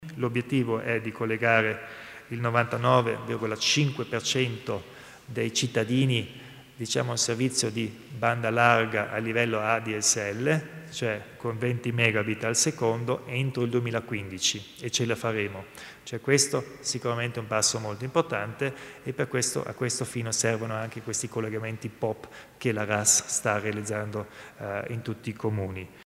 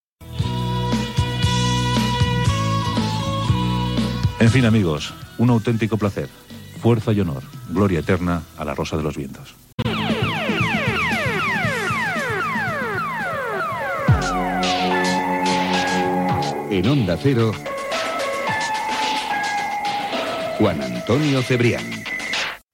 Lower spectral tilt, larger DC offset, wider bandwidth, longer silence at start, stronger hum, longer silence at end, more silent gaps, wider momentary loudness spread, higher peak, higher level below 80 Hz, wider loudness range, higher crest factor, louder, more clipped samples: second, -3.5 dB/octave vs -5.5 dB/octave; neither; about the same, 16 kHz vs 16.5 kHz; second, 0 s vs 0.2 s; neither; about the same, 0.15 s vs 0.15 s; second, none vs 9.73-9.78 s; first, 13 LU vs 7 LU; about the same, -4 dBFS vs -4 dBFS; second, -66 dBFS vs -40 dBFS; about the same, 4 LU vs 3 LU; first, 24 dB vs 18 dB; second, -27 LUFS vs -21 LUFS; neither